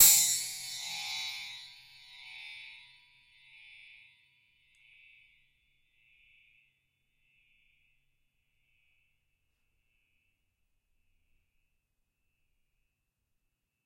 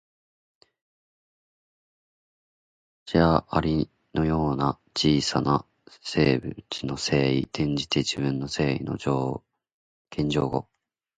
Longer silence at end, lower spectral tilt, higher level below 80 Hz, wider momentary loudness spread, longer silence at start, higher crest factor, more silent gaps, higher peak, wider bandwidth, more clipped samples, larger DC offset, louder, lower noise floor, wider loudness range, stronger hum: first, 11.1 s vs 0.55 s; second, 3 dB/octave vs -5.5 dB/octave; second, -76 dBFS vs -46 dBFS; first, 27 LU vs 9 LU; second, 0 s vs 3.05 s; first, 30 dB vs 22 dB; second, none vs 9.74-10.05 s; second, -8 dBFS vs -4 dBFS; first, 16 kHz vs 9.4 kHz; neither; neither; second, -29 LUFS vs -25 LUFS; second, -82 dBFS vs under -90 dBFS; first, 23 LU vs 4 LU; neither